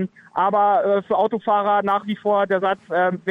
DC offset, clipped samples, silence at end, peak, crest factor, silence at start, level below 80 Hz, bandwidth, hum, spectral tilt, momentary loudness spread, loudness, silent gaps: under 0.1%; under 0.1%; 0 s; -8 dBFS; 12 dB; 0 s; -68 dBFS; 5.4 kHz; none; -7.5 dB/octave; 5 LU; -20 LUFS; none